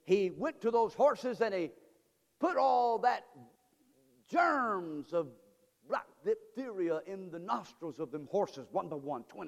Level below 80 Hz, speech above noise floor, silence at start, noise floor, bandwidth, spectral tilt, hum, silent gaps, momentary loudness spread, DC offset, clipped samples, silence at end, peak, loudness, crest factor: -78 dBFS; 39 dB; 0.05 s; -72 dBFS; 14 kHz; -6 dB/octave; none; none; 13 LU; under 0.1%; under 0.1%; 0 s; -16 dBFS; -34 LUFS; 18 dB